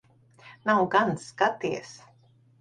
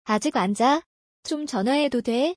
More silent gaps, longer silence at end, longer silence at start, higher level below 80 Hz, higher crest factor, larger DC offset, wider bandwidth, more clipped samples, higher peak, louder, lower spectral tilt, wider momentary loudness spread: second, none vs 0.86-1.23 s; first, 0.7 s vs 0.05 s; first, 0.45 s vs 0.05 s; about the same, -66 dBFS vs -66 dBFS; first, 20 dB vs 14 dB; neither; about the same, 10.5 kHz vs 10.5 kHz; neither; about the same, -8 dBFS vs -8 dBFS; second, -26 LUFS vs -23 LUFS; about the same, -5 dB/octave vs -4.5 dB/octave; first, 12 LU vs 9 LU